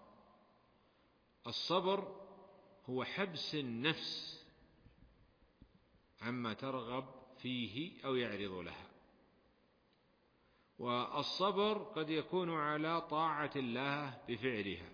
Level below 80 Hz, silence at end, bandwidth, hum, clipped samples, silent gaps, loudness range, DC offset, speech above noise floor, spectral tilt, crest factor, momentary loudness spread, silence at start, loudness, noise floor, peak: -74 dBFS; 0 s; 5.4 kHz; none; under 0.1%; none; 8 LU; under 0.1%; 34 dB; -3 dB/octave; 20 dB; 13 LU; 0 s; -39 LUFS; -74 dBFS; -22 dBFS